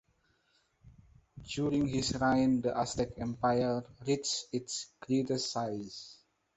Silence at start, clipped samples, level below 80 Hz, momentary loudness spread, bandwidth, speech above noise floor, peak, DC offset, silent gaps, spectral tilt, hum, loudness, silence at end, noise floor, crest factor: 0.85 s; under 0.1%; -58 dBFS; 13 LU; 8.4 kHz; 41 dB; -16 dBFS; under 0.1%; none; -5 dB/octave; none; -33 LUFS; 0.45 s; -73 dBFS; 18 dB